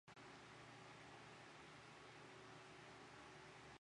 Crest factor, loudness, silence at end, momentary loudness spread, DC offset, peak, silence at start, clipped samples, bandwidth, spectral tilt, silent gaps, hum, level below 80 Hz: 14 dB; -60 LUFS; 0 s; 1 LU; under 0.1%; -48 dBFS; 0.05 s; under 0.1%; 11 kHz; -4 dB/octave; none; none; -82 dBFS